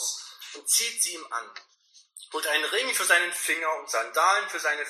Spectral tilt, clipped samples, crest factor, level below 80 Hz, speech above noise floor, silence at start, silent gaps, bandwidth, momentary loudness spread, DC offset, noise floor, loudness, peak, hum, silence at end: 3 dB/octave; under 0.1%; 20 dB; under -90 dBFS; 25 dB; 0 s; none; 14 kHz; 14 LU; under 0.1%; -52 dBFS; -25 LUFS; -8 dBFS; none; 0 s